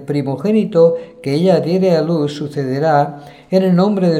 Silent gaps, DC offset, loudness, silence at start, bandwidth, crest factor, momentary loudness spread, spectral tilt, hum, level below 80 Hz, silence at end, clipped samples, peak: none; under 0.1%; -15 LUFS; 0 s; 11 kHz; 14 dB; 8 LU; -8 dB/octave; none; -60 dBFS; 0 s; under 0.1%; 0 dBFS